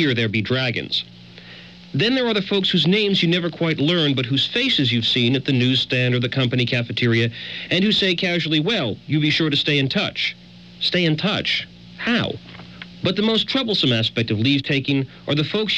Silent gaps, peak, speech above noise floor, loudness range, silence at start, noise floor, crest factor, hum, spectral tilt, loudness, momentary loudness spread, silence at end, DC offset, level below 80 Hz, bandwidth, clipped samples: none; -6 dBFS; 21 dB; 3 LU; 0 s; -41 dBFS; 14 dB; none; -6 dB/octave; -19 LUFS; 7 LU; 0 s; under 0.1%; -56 dBFS; 8.8 kHz; under 0.1%